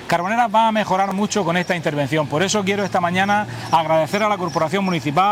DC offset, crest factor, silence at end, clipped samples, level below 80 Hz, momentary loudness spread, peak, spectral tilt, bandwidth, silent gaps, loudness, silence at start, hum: under 0.1%; 16 dB; 0 s; under 0.1%; -56 dBFS; 3 LU; -2 dBFS; -4.5 dB/octave; 16.5 kHz; none; -19 LUFS; 0 s; none